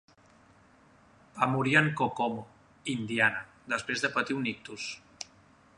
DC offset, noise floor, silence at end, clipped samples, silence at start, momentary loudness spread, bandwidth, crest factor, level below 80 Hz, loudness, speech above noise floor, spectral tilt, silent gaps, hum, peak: under 0.1%; -60 dBFS; 0.55 s; under 0.1%; 1.35 s; 18 LU; 11.5 kHz; 24 dB; -68 dBFS; -29 LUFS; 31 dB; -4.5 dB/octave; none; none; -8 dBFS